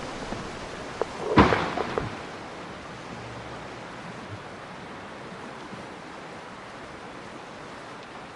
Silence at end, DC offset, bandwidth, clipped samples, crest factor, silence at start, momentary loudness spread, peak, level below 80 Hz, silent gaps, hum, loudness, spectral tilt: 0 s; under 0.1%; 11.5 kHz; under 0.1%; 30 dB; 0 s; 17 LU; -2 dBFS; -48 dBFS; none; none; -31 LUFS; -5.5 dB/octave